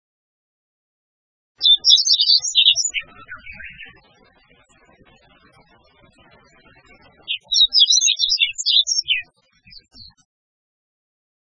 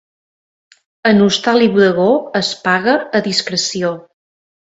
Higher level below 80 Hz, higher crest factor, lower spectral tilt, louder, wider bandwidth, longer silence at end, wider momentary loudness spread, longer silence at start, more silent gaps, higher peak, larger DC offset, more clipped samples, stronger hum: about the same, -58 dBFS vs -58 dBFS; first, 22 dB vs 16 dB; second, 4 dB/octave vs -4.5 dB/octave; about the same, -14 LUFS vs -14 LUFS; about the same, 8 kHz vs 8 kHz; first, 2.25 s vs 0.7 s; first, 24 LU vs 7 LU; first, 1.6 s vs 1.05 s; neither; about the same, 0 dBFS vs 0 dBFS; neither; neither; neither